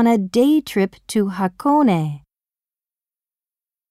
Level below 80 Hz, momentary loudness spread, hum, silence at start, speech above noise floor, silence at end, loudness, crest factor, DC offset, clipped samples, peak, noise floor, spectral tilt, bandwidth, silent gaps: -60 dBFS; 6 LU; none; 0 s; over 73 dB; 1.75 s; -18 LUFS; 14 dB; under 0.1%; under 0.1%; -4 dBFS; under -90 dBFS; -6.5 dB/octave; 15 kHz; none